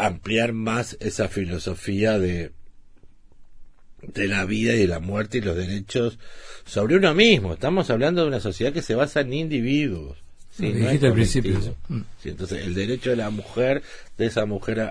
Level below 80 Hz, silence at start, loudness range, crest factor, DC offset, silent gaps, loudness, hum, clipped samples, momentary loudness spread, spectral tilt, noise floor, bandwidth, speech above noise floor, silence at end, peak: -40 dBFS; 0 s; 6 LU; 20 dB; 0.2%; none; -23 LUFS; none; under 0.1%; 12 LU; -6 dB/octave; -47 dBFS; 10.5 kHz; 24 dB; 0 s; -2 dBFS